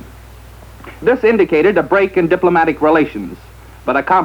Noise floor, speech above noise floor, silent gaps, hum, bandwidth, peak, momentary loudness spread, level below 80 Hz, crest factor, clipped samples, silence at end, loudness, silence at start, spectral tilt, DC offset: -37 dBFS; 24 dB; none; none; 19.5 kHz; -2 dBFS; 9 LU; -40 dBFS; 14 dB; under 0.1%; 0 s; -13 LUFS; 0.05 s; -7.5 dB/octave; under 0.1%